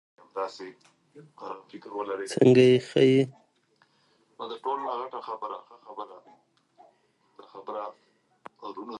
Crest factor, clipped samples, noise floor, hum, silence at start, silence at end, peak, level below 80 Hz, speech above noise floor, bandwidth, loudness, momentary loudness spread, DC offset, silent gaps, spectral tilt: 22 dB; under 0.1%; -67 dBFS; none; 0.35 s; 0 s; -6 dBFS; -72 dBFS; 40 dB; 11.5 kHz; -25 LUFS; 24 LU; under 0.1%; none; -6.5 dB/octave